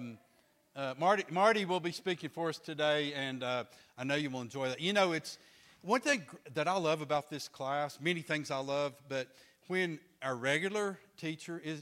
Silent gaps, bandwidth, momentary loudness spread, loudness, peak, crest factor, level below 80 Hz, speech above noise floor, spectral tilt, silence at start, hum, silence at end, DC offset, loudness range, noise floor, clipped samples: none; 16 kHz; 12 LU; -34 LUFS; -14 dBFS; 22 dB; -80 dBFS; 35 dB; -4.5 dB/octave; 0 s; none; 0 s; under 0.1%; 3 LU; -70 dBFS; under 0.1%